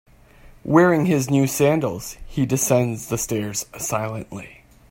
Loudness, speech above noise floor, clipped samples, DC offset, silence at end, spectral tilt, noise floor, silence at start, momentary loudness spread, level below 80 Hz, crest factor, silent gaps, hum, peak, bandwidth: -20 LUFS; 27 dB; under 0.1%; under 0.1%; 0.4 s; -5.5 dB/octave; -48 dBFS; 0.45 s; 16 LU; -48 dBFS; 20 dB; none; none; -2 dBFS; 16.5 kHz